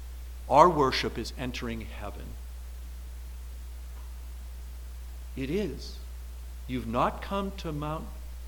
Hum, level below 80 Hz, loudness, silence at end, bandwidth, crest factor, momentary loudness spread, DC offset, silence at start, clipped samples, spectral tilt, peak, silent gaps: 60 Hz at -40 dBFS; -40 dBFS; -29 LUFS; 0 s; 19 kHz; 28 dB; 18 LU; under 0.1%; 0 s; under 0.1%; -5.5 dB/octave; -4 dBFS; none